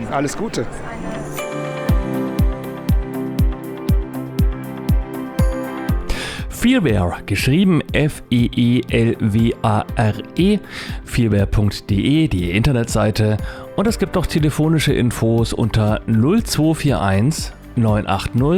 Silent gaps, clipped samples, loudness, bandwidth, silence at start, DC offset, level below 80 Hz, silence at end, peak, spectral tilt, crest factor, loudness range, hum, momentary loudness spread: none; under 0.1%; -19 LUFS; 17 kHz; 0 s; under 0.1%; -26 dBFS; 0 s; -2 dBFS; -6.5 dB/octave; 16 dB; 5 LU; none; 9 LU